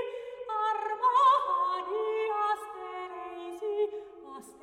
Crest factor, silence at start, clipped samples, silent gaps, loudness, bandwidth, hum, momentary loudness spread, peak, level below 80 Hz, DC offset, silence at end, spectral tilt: 16 dB; 0 s; under 0.1%; none; -29 LUFS; 13.5 kHz; none; 17 LU; -14 dBFS; -74 dBFS; under 0.1%; 0.1 s; -2.5 dB/octave